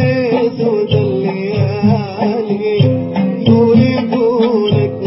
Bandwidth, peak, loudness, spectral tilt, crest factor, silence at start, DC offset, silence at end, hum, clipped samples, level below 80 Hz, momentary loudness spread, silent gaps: 5.8 kHz; 0 dBFS; -13 LUFS; -11.5 dB/octave; 12 dB; 0 s; under 0.1%; 0 s; none; under 0.1%; -42 dBFS; 6 LU; none